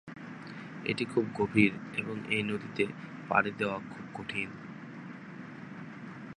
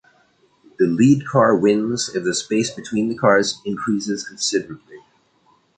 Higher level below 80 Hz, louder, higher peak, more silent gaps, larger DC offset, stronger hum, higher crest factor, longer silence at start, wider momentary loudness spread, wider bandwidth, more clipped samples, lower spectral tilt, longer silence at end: second, -68 dBFS vs -60 dBFS; second, -32 LUFS vs -19 LUFS; second, -8 dBFS vs -2 dBFS; neither; neither; neither; first, 26 dB vs 18 dB; second, 0.05 s vs 0.8 s; first, 17 LU vs 10 LU; first, 10.5 kHz vs 9.4 kHz; neither; first, -6.5 dB/octave vs -4.5 dB/octave; second, 0.05 s vs 0.8 s